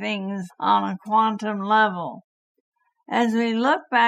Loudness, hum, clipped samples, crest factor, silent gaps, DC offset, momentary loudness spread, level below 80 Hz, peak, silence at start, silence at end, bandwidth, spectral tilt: -22 LUFS; none; under 0.1%; 16 dB; 2.24-2.72 s; under 0.1%; 9 LU; -80 dBFS; -6 dBFS; 0 s; 0 s; 11.5 kHz; -5.5 dB/octave